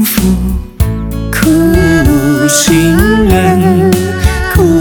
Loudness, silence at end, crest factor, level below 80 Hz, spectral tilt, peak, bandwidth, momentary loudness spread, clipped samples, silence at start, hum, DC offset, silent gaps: -9 LUFS; 0 s; 8 dB; -18 dBFS; -5 dB/octave; 0 dBFS; over 20 kHz; 7 LU; 0.8%; 0 s; none; under 0.1%; none